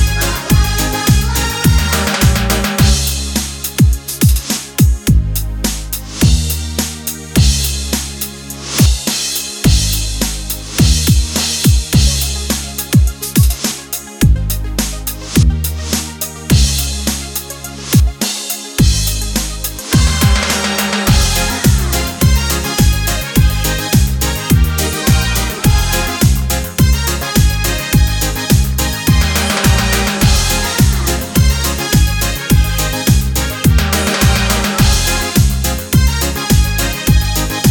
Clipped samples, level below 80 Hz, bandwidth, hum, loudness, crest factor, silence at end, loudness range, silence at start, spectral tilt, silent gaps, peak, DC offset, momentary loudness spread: under 0.1%; -16 dBFS; over 20 kHz; none; -14 LUFS; 12 dB; 0 s; 3 LU; 0 s; -4 dB/octave; none; 0 dBFS; under 0.1%; 6 LU